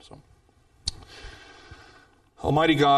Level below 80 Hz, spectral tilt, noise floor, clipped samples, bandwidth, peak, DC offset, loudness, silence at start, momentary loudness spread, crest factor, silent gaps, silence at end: -48 dBFS; -5.5 dB/octave; -60 dBFS; under 0.1%; 12 kHz; -8 dBFS; under 0.1%; -25 LUFS; 0.85 s; 27 LU; 18 dB; none; 0 s